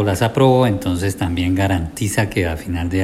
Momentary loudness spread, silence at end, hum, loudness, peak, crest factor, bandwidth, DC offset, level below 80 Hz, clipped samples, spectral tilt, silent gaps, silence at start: 8 LU; 0 s; none; -18 LUFS; -2 dBFS; 16 dB; 15.5 kHz; under 0.1%; -38 dBFS; under 0.1%; -6 dB/octave; none; 0 s